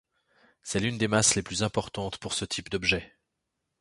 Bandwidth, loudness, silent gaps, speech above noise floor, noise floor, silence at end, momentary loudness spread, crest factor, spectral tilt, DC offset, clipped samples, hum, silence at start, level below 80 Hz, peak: 11.5 kHz; -27 LUFS; none; 54 dB; -82 dBFS; 0.75 s; 11 LU; 22 dB; -3 dB/octave; under 0.1%; under 0.1%; none; 0.65 s; -52 dBFS; -8 dBFS